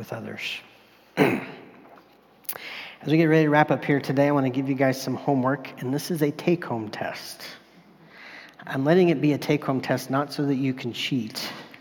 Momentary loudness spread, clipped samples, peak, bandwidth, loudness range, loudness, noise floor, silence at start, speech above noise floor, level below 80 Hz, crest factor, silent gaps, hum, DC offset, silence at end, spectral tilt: 16 LU; under 0.1%; -4 dBFS; 18 kHz; 6 LU; -24 LUFS; -55 dBFS; 0 s; 31 dB; -72 dBFS; 20 dB; none; none; under 0.1%; 0.1 s; -6 dB/octave